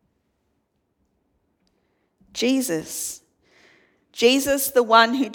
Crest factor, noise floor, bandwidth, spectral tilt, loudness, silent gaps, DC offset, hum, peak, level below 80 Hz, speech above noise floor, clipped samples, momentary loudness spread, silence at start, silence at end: 22 dB; -72 dBFS; 19 kHz; -2 dB/octave; -20 LUFS; none; under 0.1%; none; -2 dBFS; -62 dBFS; 52 dB; under 0.1%; 18 LU; 2.35 s; 0 s